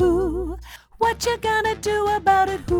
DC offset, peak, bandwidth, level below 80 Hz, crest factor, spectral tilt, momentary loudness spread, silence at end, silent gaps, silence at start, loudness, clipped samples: under 0.1%; -6 dBFS; 19 kHz; -36 dBFS; 14 dB; -4.5 dB/octave; 10 LU; 0 s; none; 0 s; -21 LUFS; under 0.1%